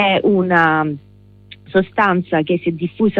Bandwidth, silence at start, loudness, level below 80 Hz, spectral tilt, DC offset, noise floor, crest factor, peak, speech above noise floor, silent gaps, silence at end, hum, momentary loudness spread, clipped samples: 5.8 kHz; 0 s; -16 LUFS; -52 dBFS; -8.5 dB/octave; under 0.1%; -43 dBFS; 14 dB; -2 dBFS; 27 dB; none; 0 s; 50 Hz at -40 dBFS; 8 LU; under 0.1%